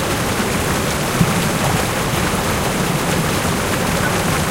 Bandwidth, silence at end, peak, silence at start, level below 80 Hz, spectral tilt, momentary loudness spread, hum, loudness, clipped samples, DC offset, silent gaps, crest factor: 16 kHz; 0 s; 0 dBFS; 0 s; -32 dBFS; -4 dB/octave; 2 LU; none; -17 LUFS; under 0.1%; under 0.1%; none; 18 dB